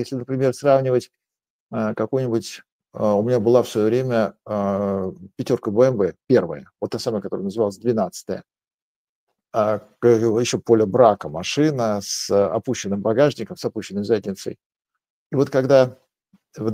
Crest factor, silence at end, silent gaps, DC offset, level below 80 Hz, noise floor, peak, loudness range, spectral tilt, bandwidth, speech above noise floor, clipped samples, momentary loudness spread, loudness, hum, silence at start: 20 dB; 0 s; 1.50-1.67 s, 2.72-2.79 s, 8.74-9.27 s, 14.66-14.70 s, 14.76-14.80 s, 15.10-15.30 s; under 0.1%; -62 dBFS; -62 dBFS; 0 dBFS; 4 LU; -6 dB/octave; 16 kHz; 42 dB; under 0.1%; 12 LU; -21 LUFS; none; 0 s